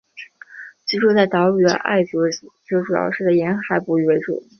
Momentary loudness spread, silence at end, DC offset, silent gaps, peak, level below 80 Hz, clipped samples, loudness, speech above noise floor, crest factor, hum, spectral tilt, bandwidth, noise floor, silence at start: 21 LU; 0.2 s; under 0.1%; none; -2 dBFS; -64 dBFS; under 0.1%; -18 LUFS; 23 dB; 16 dB; none; -5.5 dB/octave; 6.6 kHz; -41 dBFS; 0.15 s